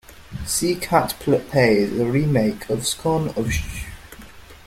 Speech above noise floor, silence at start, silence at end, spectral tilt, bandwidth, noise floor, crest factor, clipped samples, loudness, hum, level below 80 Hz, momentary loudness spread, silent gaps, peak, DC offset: 22 dB; 0.1 s; 0.1 s; -5 dB/octave; 16.5 kHz; -42 dBFS; 18 dB; under 0.1%; -21 LUFS; none; -40 dBFS; 16 LU; none; -4 dBFS; under 0.1%